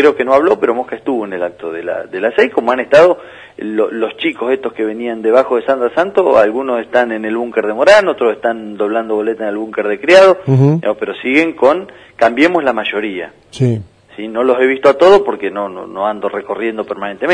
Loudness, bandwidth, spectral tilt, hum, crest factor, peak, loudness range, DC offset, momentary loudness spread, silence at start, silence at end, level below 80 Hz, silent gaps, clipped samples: -13 LUFS; 10.5 kHz; -6.5 dB/octave; none; 14 dB; 0 dBFS; 3 LU; under 0.1%; 13 LU; 0 s; 0 s; -54 dBFS; none; 0.1%